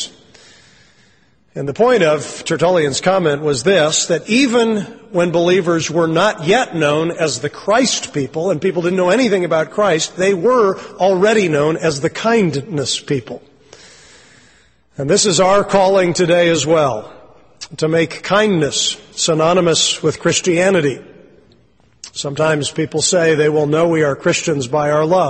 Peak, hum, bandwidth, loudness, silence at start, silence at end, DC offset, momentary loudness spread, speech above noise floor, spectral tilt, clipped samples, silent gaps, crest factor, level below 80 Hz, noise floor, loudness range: -2 dBFS; none; 8.8 kHz; -15 LUFS; 0 s; 0 s; under 0.1%; 9 LU; 40 dB; -4 dB/octave; under 0.1%; none; 14 dB; -52 dBFS; -55 dBFS; 3 LU